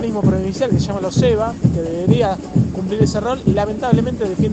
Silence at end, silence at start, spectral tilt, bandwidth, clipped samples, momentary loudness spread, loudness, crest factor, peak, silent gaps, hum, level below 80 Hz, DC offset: 0 s; 0 s; -7.5 dB/octave; 8.6 kHz; under 0.1%; 3 LU; -17 LUFS; 16 dB; 0 dBFS; none; none; -34 dBFS; under 0.1%